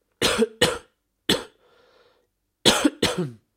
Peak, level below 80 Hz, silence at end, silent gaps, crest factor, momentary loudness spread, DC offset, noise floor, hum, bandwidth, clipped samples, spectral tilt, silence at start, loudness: -2 dBFS; -50 dBFS; 0.2 s; none; 24 dB; 11 LU; under 0.1%; -71 dBFS; none; 16 kHz; under 0.1%; -3 dB/octave; 0.2 s; -22 LUFS